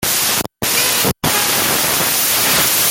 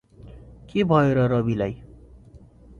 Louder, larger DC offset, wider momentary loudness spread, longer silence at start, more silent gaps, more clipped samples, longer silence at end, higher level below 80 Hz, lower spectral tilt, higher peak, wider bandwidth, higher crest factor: first, -13 LUFS vs -22 LUFS; neither; second, 4 LU vs 11 LU; second, 0 s vs 0.2 s; neither; neither; second, 0 s vs 0.4 s; about the same, -44 dBFS vs -48 dBFS; second, -1 dB/octave vs -9 dB/octave; about the same, -2 dBFS vs -4 dBFS; first, 17 kHz vs 7.2 kHz; second, 14 dB vs 20 dB